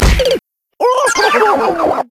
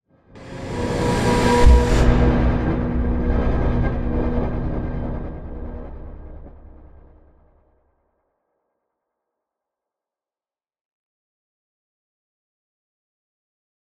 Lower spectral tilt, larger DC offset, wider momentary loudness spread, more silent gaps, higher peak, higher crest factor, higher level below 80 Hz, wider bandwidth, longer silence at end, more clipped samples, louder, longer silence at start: second, -4 dB/octave vs -7 dB/octave; neither; second, 6 LU vs 21 LU; neither; about the same, 0 dBFS vs -2 dBFS; second, 12 dB vs 20 dB; about the same, -20 dBFS vs -24 dBFS; first, 16 kHz vs 11.5 kHz; second, 0.05 s vs 7.5 s; neither; first, -13 LUFS vs -20 LUFS; second, 0 s vs 0.35 s